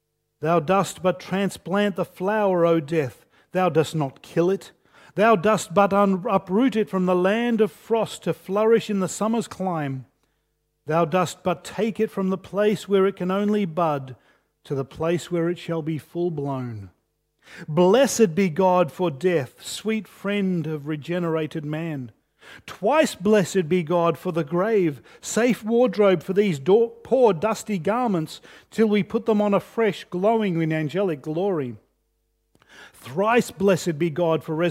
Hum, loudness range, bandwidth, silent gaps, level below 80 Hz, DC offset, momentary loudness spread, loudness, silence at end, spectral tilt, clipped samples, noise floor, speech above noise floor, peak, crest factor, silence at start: none; 5 LU; 16 kHz; none; -64 dBFS; under 0.1%; 10 LU; -23 LUFS; 0 s; -6 dB/octave; under 0.1%; -73 dBFS; 50 dB; -4 dBFS; 18 dB; 0.4 s